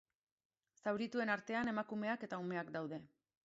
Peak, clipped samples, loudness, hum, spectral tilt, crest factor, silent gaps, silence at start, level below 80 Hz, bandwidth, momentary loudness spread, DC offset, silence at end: -24 dBFS; under 0.1%; -41 LUFS; none; -4 dB/octave; 20 dB; none; 0.85 s; -80 dBFS; 7.6 kHz; 7 LU; under 0.1%; 0.4 s